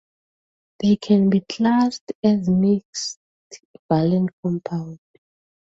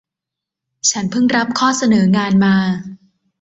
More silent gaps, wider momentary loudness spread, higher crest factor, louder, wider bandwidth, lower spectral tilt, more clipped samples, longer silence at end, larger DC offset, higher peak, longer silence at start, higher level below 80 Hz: first, 2.01-2.07 s, 2.15-2.23 s, 2.85-2.93 s, 3.16-3.50 s, 3.65-3.89 s, 4.33-4.43 s vs none; first, 12 LU vs 7 LU; about the same, 16 dB vs 14 dB; second, -21 LUFS vs -15 LUFS; about the same, 8 kHz vs 8 kHz; first, -6.5 dB/octave vs -4.5 dB/octave; neither; first, 0.8 s vs 0.45 s; neither; about the same, -4 dBFS vs -2 dBFS; about the same, 0.8 s vs 0.85 s; about the same, -58 dBFS vs -54 dBFS